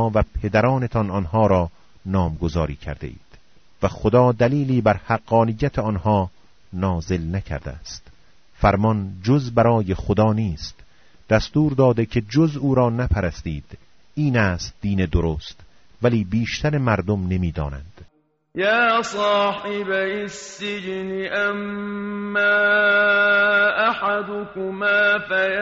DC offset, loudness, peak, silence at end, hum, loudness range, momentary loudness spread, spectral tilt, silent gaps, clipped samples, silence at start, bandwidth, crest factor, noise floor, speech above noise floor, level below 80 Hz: under 0.1%; -20 LUFS; -2 dBFS; 0 s; none; 6 LU; 14 LU; -5 dB/octave; none; under 0.1%; 0 s; 7.6 kHz; 18 dB; -58 dBFS; 38 dB; -38 dBFS